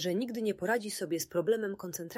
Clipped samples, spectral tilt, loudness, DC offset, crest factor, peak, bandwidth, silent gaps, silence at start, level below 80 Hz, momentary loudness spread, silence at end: under 0.1%; -4 dB/octave; -33 LUFS; under 0.1%; 16 dB; -18 dBFS; 16 kHz; none; 0 s; -74 dBFS; 5 LU; 0 s